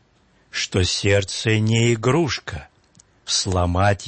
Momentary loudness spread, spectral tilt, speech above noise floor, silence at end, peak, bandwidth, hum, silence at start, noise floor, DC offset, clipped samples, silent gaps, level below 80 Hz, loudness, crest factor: 12 LU; -4.5 dB/octave; 39 dB; 0 s; -4 dBFS; 8.8 kHz; none; 0.55 s; -59 dBFS; under 0.1%; under 0.1%; none; -44 dBFS; -20 LUFS; 16 dB